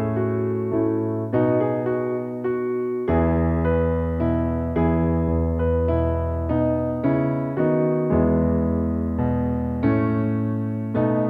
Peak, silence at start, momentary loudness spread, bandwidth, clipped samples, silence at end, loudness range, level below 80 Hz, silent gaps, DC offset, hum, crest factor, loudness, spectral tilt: -8 dBFS; 0 s; 4 LU; 3.9 kHz; under 0.1%; 0 s; 1 LU; -34 dBFS; none; under 0.1%; none; 14 dB; -22 LUFS; -11.5 dB/octave